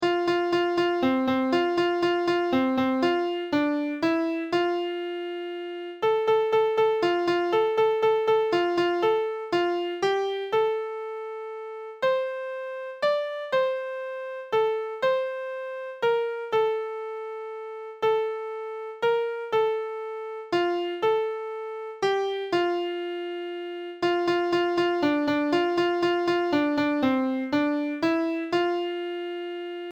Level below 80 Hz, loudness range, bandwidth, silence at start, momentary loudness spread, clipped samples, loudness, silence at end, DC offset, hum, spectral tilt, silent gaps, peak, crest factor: -68 dBFS; 5 LU; 8.8 kHz; 0 s; 11 LU; under 0.1%; -26 LUFS; 0 s; under 0.1%; none; -5.5 dB/octave; none; -12 dBFS; 14 dB